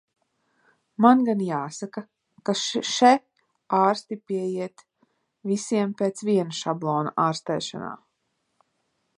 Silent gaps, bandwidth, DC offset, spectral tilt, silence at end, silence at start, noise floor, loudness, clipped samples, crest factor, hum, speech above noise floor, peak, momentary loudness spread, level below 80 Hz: none; 11 kHz; under 0.1%; -5 dB/octave; 1.2 s; 1 s; -75 dBFS; -24 LUFS; under 0.1%; 22 dB; none; 52 dB; -2 dBFS; 18 LU; -76 dBFS